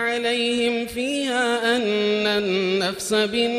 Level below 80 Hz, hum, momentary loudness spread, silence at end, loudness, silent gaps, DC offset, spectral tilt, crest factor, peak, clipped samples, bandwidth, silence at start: -58 dBFS; none; 3 LU; 0 s; -21 LUFS; none; under 0.1%; -3.5 dB/octave; 14 dB; -6 dBFS; under 0.1%; 15.5 kHz; 0 s